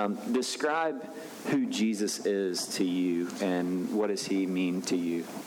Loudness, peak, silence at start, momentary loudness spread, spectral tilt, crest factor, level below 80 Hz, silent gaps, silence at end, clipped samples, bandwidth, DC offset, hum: -30 LUFS; -16 dBFS; 0 s; 3 LU; -4.5 dB/octave; 14 dB; -82 dBFS; none; 0 s; under 0.1%; 19.5 kHz; under 0.1%; none